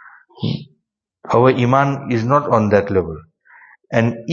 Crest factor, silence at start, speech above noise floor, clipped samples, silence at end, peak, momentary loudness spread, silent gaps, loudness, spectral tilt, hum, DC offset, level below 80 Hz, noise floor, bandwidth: 18 dB; 0.05 s; 55 dB; under 0.1%; 0 s; 0 dBFS; 13 LU; none; -17 LUFS; -8 dB/octave; none; under 0.1%; -48 dBFS; -71 dBFS; 7.2 kHz